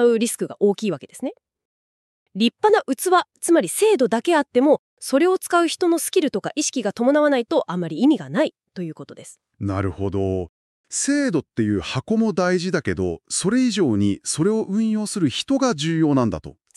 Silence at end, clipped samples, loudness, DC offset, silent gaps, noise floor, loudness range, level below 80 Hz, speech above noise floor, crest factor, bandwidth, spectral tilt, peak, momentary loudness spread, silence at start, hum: 0.25 s; under 0.1%; -21 LUFS; under 0.1%; 1.65-2.26 s, 4.79-4.97 s, 10.49-10.84 s; under -90 dBFS; 6 LU; -54 dBFS; over 70 dB; 16 dB; 13.5 kHz; -5 dB/octave; -4 dBFS; 10 LU; 0 s; none